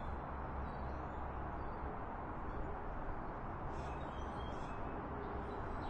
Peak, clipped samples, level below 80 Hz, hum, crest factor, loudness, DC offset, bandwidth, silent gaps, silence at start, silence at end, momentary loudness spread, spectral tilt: -30 dBFS; under 0.1%; -48 dBFS; none; 12 dB; -45 LUFS; under 0.1%; 8.6 kHz; none; 0 s; 0 s; 1 LU; -8 dB/octave